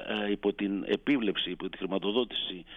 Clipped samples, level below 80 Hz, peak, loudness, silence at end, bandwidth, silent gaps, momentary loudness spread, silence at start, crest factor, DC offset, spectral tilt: under 0.1%; -58 dBFS; -14 dBFS; -31 LUFS; 0 s; 6.6 kHz; none; 6 LU; 0 s; 16 dB; under 0.1%; -7 dB/octave